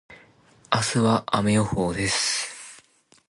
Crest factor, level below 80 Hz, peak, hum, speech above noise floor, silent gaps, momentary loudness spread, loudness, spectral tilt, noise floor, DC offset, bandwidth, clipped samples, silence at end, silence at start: 20 dB; -50 dBFS; -6 dBFS; none; 35 dB; none; 11 LU; -23 LUFS; -4 dB/octave; -57 dBFS; under 0.1%; 11.5 kHz; under 0.1%; 0.55 s; 0.1 s